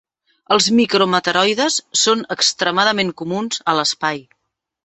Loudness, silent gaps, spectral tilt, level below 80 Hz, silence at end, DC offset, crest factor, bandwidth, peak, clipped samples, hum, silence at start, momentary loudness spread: -16 LUFS; none; -2.5 dB/octave; -60 dBFS; 0.65 s; under 0.1%; 18 dB; 8.4 kHz; 0 dBFS; under 0.1%; none; 0.5 s; 8 LU